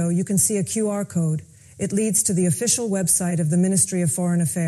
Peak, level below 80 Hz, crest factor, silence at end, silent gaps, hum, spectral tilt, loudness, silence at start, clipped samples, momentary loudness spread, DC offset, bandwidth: -6 dBFS; -58 dBFS; 16 dB; 0 s; none; none; -5 dB/octave; -20 LUFS; 0 s; under 0.1%; 5 LU; under 0.1%; 14.5 kHz